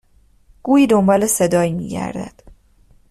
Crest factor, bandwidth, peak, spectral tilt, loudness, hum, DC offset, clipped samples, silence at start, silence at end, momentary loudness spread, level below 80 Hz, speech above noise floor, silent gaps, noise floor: 16 dB; 14 kHz; -4 dBFS; -5.5 dB/octave; -16 LUFS; none; under 0.1%; under 0.1%; 0.65 s; 0.6 s; 17 LU; -48 dBFS; 36 dB; none; -52 dBFS